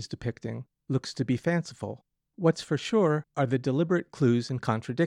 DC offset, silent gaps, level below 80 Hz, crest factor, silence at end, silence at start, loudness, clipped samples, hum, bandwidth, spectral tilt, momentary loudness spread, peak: under 0.1%; none; -64 dBFS; 16 dB; 0 s; 0 s; -28 LUFS; under 0.1%; none; 11 kHz; -7 dB/octave; 13 LU; -12 dBFS